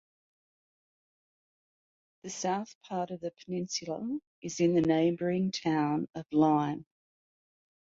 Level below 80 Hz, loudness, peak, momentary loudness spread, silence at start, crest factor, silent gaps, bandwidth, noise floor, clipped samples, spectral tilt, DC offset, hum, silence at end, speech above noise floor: -70 dBFS; -31 LUFS; -14 dBFS; 13 LU; 2.25 s; 20 dB; 2.75-2.81 s, 4.27-4.42 s; 7.8 kHz; under -90 dBFS; under 0.1%; -5.5 dB/octave; under 0.1%; none; 1 s; over 60 dB